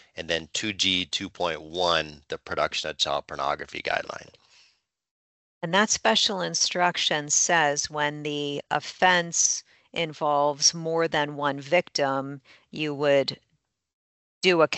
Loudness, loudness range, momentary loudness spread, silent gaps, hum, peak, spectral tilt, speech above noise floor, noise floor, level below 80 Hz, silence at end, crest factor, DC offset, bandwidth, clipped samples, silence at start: -24 LUFS; 5 LU; 10 LU; 5.11-5.61 s, 13.93-14.41 s; none; -6 dBFS; -2 dB/octave; 49 dB; -74 dBFS; -64 dBFS; 0 s; 22 dB; under 0.1%; 8.2 kHz; under 0.1%; 0.15 s